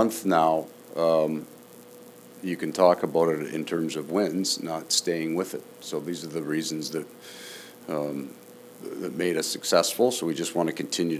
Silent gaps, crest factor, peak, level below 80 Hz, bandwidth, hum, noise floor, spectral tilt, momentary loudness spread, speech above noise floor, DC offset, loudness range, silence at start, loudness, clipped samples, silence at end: none; 22 dB; -4 dBFS; -74 dBFS; 16 kHz; none; -48 dBFS; -4 dB/octave; 18 LU; 21 dB; under 0.1%; 7 LU; 0 s; -26 LUFS; under 0.1%; 0 s